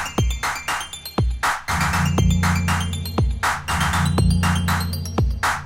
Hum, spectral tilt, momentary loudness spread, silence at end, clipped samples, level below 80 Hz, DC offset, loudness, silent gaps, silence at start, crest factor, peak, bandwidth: none; -4.5 dB/octave; 6 LU; 0 s; under 0.1%; -28 dBFS; under 0.1%; -21 LUFS; none; 0 s; 14 dB; -6 dBFS; 17 kHz